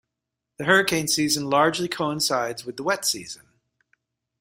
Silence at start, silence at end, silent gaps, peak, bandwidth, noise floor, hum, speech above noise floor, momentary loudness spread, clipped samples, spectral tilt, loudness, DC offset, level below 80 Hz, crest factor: 0.6 s; 1.05 s; none; -4 dBFS; 16 kHz; -84 dBFS; none; 61 dB; 11 LU; under 0.1%; -3 dB/octave; -22 LUFS; under 0.1%; -62 dBFS; 22 dB